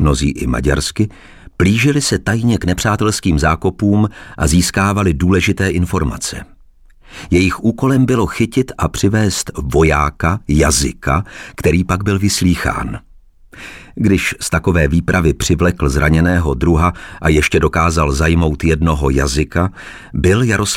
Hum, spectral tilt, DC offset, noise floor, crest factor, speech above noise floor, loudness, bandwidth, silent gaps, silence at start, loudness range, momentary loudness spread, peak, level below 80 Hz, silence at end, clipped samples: none; -5.5 dB/octave; under 0.1%; -44 dBFS; 12 dB; 30 dB; -15 LUFS; 16.5 kHz; none; 0 s; 3 LU; 7 LU; -2 dBFS; -24 dBFS; 0 s; under 0.1%